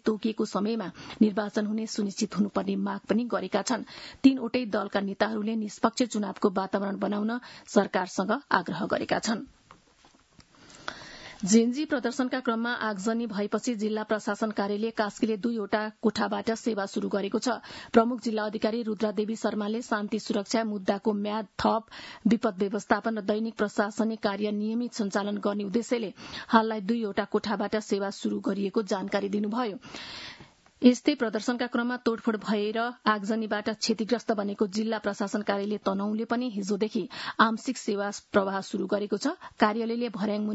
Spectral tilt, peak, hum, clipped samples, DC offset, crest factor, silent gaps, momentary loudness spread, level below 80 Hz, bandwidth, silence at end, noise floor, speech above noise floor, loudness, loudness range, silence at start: -5 dB/octave; -4 dBFS; none; under 0.1%; under 0.1%; 24 dB; none; 7 LU; -66 dBFS; 8 kHz; 0 s; -60 dBFS; 32 dB; -28 LUFS; 2 LU; 0.05 s